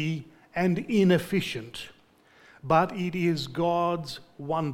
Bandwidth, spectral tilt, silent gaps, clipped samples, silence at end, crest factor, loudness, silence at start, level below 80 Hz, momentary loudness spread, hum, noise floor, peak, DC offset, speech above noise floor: 16.5 kHz; -6.5 dB/octave; none; under 0.1%; 0 s; 18 dB; -27 LUFS; 0 s; -58 dBFS; 16 LU; none; -59 dBFS; -8 dBFS; under 0.1%; 33 dB